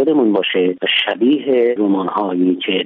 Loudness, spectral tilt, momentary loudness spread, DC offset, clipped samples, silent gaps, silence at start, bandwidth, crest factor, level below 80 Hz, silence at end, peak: -15 LUFS; -8 dB/octave; 3 LU; under 0.1%; under 0.1%; none; 0 s; 4.2 kHz; 12 dB; -68 dBFS; 0 s; -4 dBFS